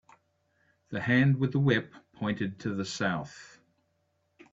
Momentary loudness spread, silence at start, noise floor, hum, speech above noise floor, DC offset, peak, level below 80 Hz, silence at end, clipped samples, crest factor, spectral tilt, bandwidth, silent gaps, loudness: 17 LU; 0.9 s; -75 dBFS; none; 46 dB; under 0.1%; -12 dBFS; -66 dBFS; 1.05 s; under 0.1%; 20 dB; -6.5 dB/octave; 7.8 kHz; none; -29 LUFS